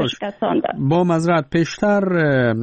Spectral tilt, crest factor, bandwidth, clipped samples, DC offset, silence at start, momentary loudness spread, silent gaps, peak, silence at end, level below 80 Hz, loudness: -7 dB/octave; 10 dB; 8.4 kHz; under 0.1%; under 0.1%; 0 s; 4 LU; none; -8 dBFS; 0 s; -50 dBFS; -18 LUFS